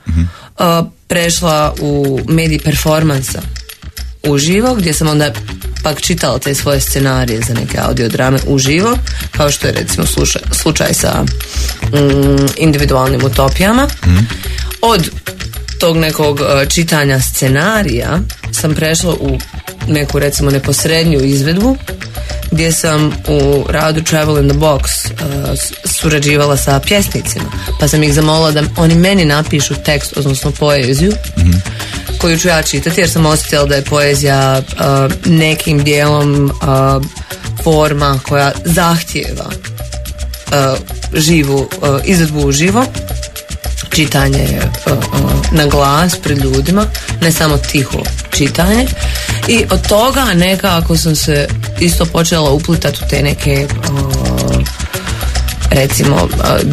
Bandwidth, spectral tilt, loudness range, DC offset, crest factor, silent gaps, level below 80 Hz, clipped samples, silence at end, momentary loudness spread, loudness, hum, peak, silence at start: 14.5 kHz; -4.5 dB/octave; 3 LU; under 0.1%; 12 dB; none; -22 dBFS; under 0.1%; 0 s; 8 LU; -12 LUFS; none; 0 dBFS; 0.05 s